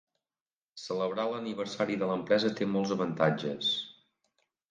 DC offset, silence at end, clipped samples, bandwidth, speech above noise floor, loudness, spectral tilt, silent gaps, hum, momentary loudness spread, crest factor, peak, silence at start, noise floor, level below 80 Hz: under 0.1%; 0.8 s; under 0.1%; 9.4 kHz; over 60 dB; -31 LUFS; -5.5 dB/octave; none; none; 8 LU; 22 dB; -10 dBFS; 0.75 s; under -90 dBFS; -74 dBFS